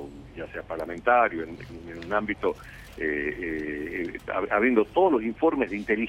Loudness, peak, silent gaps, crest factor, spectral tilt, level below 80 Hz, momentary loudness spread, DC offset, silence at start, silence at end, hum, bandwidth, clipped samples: -26 LUFS; -8 dBFS; none; 20 dB; -7 dB/octave; -52 dBFS; 18 LU; under 0.1%; 0 s; 0 s; none; 13 kHz; under 0.1%